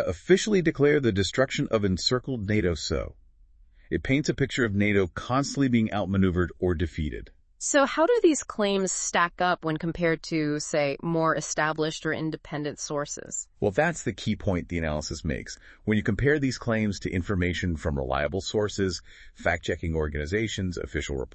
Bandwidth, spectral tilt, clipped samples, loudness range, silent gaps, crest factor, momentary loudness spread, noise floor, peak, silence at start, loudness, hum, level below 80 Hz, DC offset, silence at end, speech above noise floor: 8.8 kHz; -5 dB/octave; under 0.1%; 4 LU; none; 18 dB; 10 LU; -56 dBFS; -8 dBFS; 0 s; -26 LUFS; none; -44 dBFS; under 0.1%; 0.1 s; 29 dB